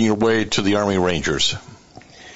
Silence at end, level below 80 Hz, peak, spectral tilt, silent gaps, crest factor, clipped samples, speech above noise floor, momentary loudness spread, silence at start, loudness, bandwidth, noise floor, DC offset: 0 s; -46 dBFS; -4 dBFS; -4 dB/octave; none; 16 dB; under 0.1%; 25 dB; 3 LU; 0 s; -19 LUFS; 8.2 kHz; -44 dBFS; under 0.1%